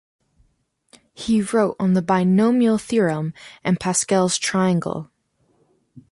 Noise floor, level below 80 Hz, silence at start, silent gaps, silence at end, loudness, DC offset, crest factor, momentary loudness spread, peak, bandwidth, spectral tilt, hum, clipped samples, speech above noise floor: -66 dBFS; -56 dBFS; 1.2 s; none; 0.1 s; -20 LUFS; under 0.1%; 16 dB; 12 LU; -6 dBFS; 11.5 kHz; -5 dB/octave; none; under 0.1%; 47 dB